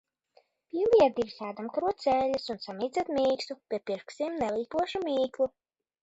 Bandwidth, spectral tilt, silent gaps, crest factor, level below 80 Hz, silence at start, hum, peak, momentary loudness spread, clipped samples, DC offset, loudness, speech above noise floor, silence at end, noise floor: 8 kHz; -5 dB/octave; none; 20 dB; -64 dBFS; 0.75 s; none; -10 dBFS; 11 LU; under 0.1%; under 0.1%; -30 LUFS; 38 dB; 0.55 s; -67 dBFS